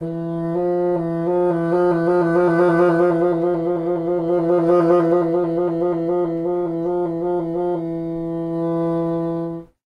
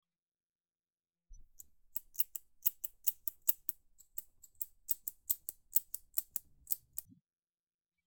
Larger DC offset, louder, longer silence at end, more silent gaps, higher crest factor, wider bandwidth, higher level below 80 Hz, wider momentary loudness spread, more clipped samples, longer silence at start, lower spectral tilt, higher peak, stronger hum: neither; first, -19 LUFS vs -37 LUFS; second, 0.3 s vs 1.05 s; neither; second, 14 dB vs 34 dB; second, 5.2 kHz vs over 20 kHz; first, -52 dBFS vs -70 dBFS; second, 9 LU vs 13 LU; neither; second, 0 s vs 1.3 s; first, -9.5 dB/octave vs 0.5 dB/octave; first, -4 dBFS vs -8 dBFS; neither